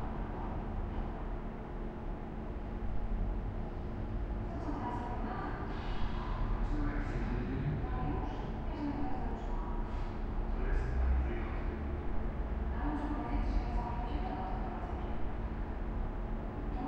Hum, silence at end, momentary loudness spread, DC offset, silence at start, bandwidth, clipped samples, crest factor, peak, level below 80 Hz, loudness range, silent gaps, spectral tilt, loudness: none; 0 s; 5 LU; under 0.1%; 0 s; 6 kHz; under 0.1%; 14 dB; -20 dBFS; -38 dBFS; 4 LU; none; -8.5 dB/octave; -39 LUFS